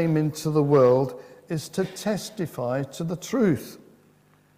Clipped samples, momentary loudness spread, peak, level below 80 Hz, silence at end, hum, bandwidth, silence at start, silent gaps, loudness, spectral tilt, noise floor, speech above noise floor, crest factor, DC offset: under 0.1%; 14 LU; -6 dBFS; -62 dBFS; 0.8 s; none; 16 kHz; 0 s; none; -25 LUFS; -6.5 dB/octave; -59 dBFS; 35 dB; 18 dB; under 0.1%